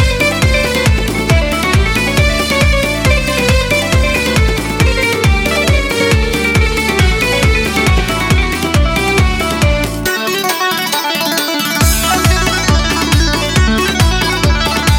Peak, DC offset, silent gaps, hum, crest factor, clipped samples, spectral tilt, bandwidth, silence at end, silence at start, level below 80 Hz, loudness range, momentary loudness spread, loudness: 0 dBFS; under 0.1%; none; none; 12 dB; under 0.1%; -4 dB/octave; 17 kHz; 0 s; 0 s; -18 dBFS; 1 LU; 2 LU; -12 LUFS